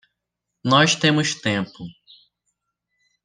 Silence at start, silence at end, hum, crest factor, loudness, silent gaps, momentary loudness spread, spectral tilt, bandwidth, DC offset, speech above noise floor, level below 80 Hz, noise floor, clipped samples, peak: 0.65 s; 1.35 s; none; 22 dB; -19 LUFS; none; 20 LU; -4 dB/octave; 10 kHz; under 0.1%; 62 dB; -64 dBFS; -81 dBFS; under 0.1%; -2 dBFS